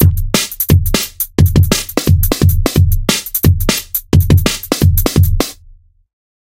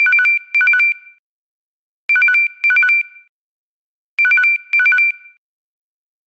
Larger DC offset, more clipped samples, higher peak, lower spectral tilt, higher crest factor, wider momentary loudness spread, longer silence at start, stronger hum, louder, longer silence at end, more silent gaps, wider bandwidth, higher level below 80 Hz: neither; neither; first, 0 dBFS vs -6 dBFS; first, -5 dB/octave vs 3.5 dB/octave; about the same, 12 dB vs 10 dB; second, 5 LU vs 14 LU; about the same, 0 s vs 0 s; neither; about the same, -13 LUFS vs -12 LUFS; second, 0.95 s vs 1.1 s; second, none vs 1.19-2.09 s, 3.29-4.17 s; first, 17.5 kHz vs 8 kHz; first, -20 dBFS vs under -90 dBFS